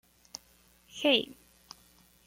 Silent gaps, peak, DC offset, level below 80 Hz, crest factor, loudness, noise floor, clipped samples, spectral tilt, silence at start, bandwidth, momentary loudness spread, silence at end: none; -12 dBFS; under 0.1%; -70 dBFS; 24 dB; -28 LUFS; -63 dBFS; under 0.1%; -2.5 dB/octave; 0.95 s; 16.5 kHz; 26 LU; 0.95 s